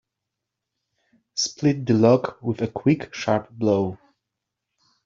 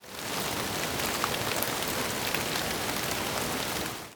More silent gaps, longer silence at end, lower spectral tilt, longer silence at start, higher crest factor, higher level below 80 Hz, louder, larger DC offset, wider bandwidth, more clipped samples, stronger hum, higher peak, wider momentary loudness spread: neither; first, 1.1 s vs 0 s; first, -6 dB/octave vs -2.5 dB/octave; first, 1.35 s vs 0 s; about the same, 20 dB vs 24 dB; second, -60 dBFS vs -54 dBFS; first, -22 LUFS vs -30 LUFS; neither; second, 7.8 kHz vs over 20 kHz; neither; neither; first, -4 dBFS vs -8 dBFS; first, 10 LU vs 2 LU